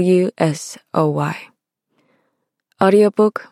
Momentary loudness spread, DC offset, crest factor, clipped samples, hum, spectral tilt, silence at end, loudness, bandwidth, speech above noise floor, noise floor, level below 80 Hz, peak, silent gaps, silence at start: 11 LU; under 0.1%; 18 dB; under 0.1%; none; -6.5 dB/octave; 0.1 s; -17 LUFS; 13 kHz; 55 dB; -71 dBFS; -66 dBFS; 0 dBFS; none; 0 s